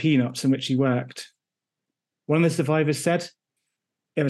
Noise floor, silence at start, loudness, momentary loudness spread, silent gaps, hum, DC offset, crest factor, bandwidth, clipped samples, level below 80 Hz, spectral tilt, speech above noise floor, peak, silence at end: -87 dBFS; 0 s; -23 LUFS; 17 LU; none; none; under 0.1%; 16 dB; 12.5 kHz; under 0.1%; -72 dBFS; -6 dB/octave; 65 dB; -10 dBFS; 0 s